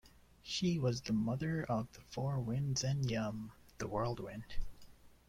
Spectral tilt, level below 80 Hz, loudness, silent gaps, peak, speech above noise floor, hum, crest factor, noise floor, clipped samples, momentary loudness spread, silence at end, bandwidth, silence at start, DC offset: -5.5 dB/octave; -52 dBFS; -38 LUFS; none; -22 dBFS; 21 dB; none; 16 dB; -58 dBFS; under 0.1%; 14 LU; 0.2 s; 15 kHz; 0.05 s; under 0.1%